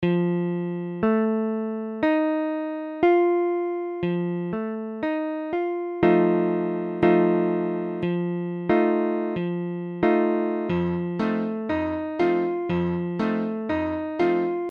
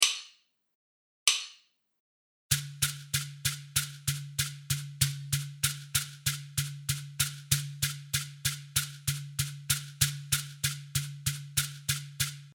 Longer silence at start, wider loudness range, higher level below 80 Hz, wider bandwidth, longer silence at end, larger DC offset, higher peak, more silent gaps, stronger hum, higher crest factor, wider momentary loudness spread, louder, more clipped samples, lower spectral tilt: about the same, 0 s vs 0 s; about the same, 2 LU vs 1 LU; about the same, -56 dBFS vs -56 dBFS; second, 5.2 kHz vs over 20 kHz; about the same, 0 s vs 0 s; neither; about the same, -4 dBFS vs -4 dBFS; second, none vs 0.75-1.26 s, 2.00-2.50 s; neither; second, 20 dB vs 30 dB; about the same, 8 LU vs 7 LU; first, -24 LUFS vs -31 LUFS; neither; first, -9.5 dB/octave vs -1.5 dB/octave